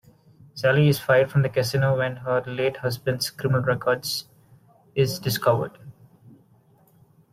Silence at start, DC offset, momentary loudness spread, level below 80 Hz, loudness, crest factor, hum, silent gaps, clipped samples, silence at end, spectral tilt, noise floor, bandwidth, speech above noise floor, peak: 0.55 s; under 0.1%; 8 LU; -58 dBFS; -23 LUFS; 18 dB; none; none; under 0.1%; 1.4 s; -5.5 dB/octave; -58 dBFS; 16 kHz; 36 dB; -6 dBFS